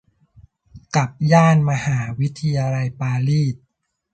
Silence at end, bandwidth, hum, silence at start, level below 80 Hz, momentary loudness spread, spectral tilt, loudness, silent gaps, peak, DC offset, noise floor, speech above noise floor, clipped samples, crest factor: 0.55 s; 8.8 kHz; none; 0.75 s; -52 dBFS; 9 LU; -7 dB/octave; -19 LUFS; none; -2 dBFS; under 0.1%; -51 dBFS; 33 dB; under 0.1%; 18 dB